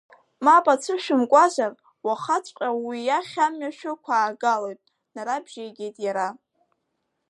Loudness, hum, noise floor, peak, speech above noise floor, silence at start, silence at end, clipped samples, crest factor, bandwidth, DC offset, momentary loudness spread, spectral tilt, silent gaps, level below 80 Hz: -23 LUFS; none; -77 dBFS; -4 dBFS; 54 dB; 0.4 s; 0.95 s; under 0.1%; 20 dB; 11.5 kHz; under 0.1%; 16 LU; -3.5 dB/octave; none; -84 dBFS